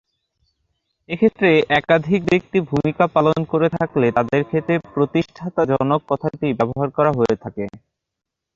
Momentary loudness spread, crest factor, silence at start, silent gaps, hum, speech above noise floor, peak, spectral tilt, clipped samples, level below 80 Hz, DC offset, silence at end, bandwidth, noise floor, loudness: 7 LU; 16 dB; 1.1 s; none; none; 64 dB; -2 dBFS; -7.5 dB/octave; under 0.1%; -52 dBFS; under 0.1%; 0.8 s; 7.6 kHz; -82 dBFS; -19 LUFS